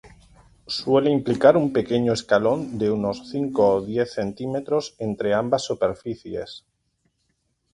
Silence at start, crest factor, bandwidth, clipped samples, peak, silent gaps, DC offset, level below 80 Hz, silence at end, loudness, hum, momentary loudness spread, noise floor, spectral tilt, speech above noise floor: 0.05 s; 22 dB; 11 kHz; under 0.1%; -2 dBFS; none; under 0.1%; -56 dBFS; 1.15 s; -22 LUFS; none; 14 LU; -71 dBFS; -6 dB/octave; 50 dB